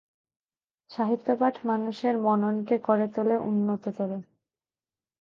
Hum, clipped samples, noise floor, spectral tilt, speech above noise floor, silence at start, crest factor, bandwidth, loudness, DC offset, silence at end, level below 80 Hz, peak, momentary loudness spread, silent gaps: none; under 0.1%; under -90 dBFS; -9 dB/octave; over 64 dB; 0.9 s; 18 dB; 6.8 kHz; -27 LUFS; under 0.1%; 0.95 s; -76 dBFS; -10 dBFS; 8 LU; none